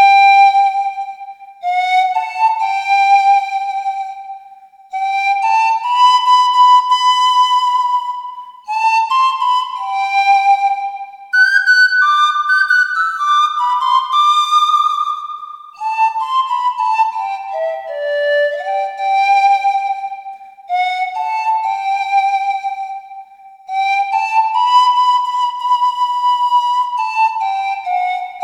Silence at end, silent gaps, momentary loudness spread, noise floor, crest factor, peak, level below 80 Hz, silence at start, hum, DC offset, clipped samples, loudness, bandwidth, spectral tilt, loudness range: 0 s; none; 14 LU; -41 dBFS; 14 dB; 0 dBFS; -74 dBFS; 0 s; none; under 0.1%; under 0.1%; -14 LUFS; 12 kHz; 3.5 dB/octave; 6 LU